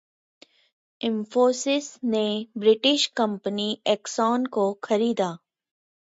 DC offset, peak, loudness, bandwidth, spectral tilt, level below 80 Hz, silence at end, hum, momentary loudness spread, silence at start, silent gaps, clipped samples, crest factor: under 0.1%; -8 dBFS; -24 LUFS; 8 kHz; -4 dB/octave; -76 dBFS; 0.75 s; none; 8 LU; 1 s; none; under 0.1%; 18 dB